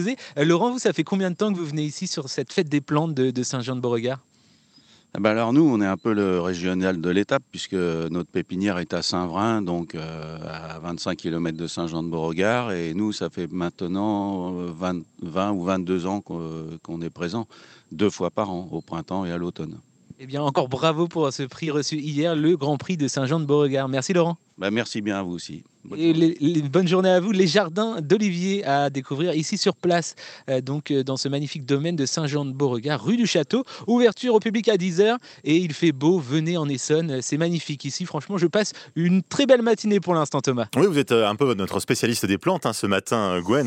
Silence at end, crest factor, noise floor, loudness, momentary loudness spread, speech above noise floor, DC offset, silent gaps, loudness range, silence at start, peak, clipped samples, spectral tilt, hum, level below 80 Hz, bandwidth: 0 s; 20 dB; -57 dBFS; -23 LUFS; 10 LU; 34 dB; under 0.1%; none; 6 LU; 0 s; -2 dBFS; under 0.1%; -5.5 dB/octave; none; -66 dBFS; 16 kHz